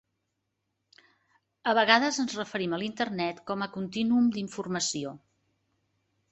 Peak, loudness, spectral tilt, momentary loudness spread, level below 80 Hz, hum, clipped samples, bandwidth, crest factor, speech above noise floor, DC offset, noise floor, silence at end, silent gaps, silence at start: -4 dBFS; -28 LUFS; -3.5 dB/octave; 12 LU; -72 dBFS; none; under 0.1%; 8.2 kHz; 26 dB; 53 dB; under 0.1%; -81 dBFS; 1.15 s; none; 1.65 s